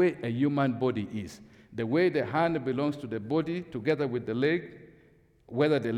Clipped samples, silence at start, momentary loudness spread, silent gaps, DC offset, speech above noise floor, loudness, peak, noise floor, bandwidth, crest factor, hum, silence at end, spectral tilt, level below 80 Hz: under 0.1%; 0 s; 11 LU; none; under 0.1%; 33 dB; -29 LUFS; -14 dBFS; -61 dBFS; 11.5 kHz; 16 dB; none; 0 s; -7.5 dB/octave; -66 dBFS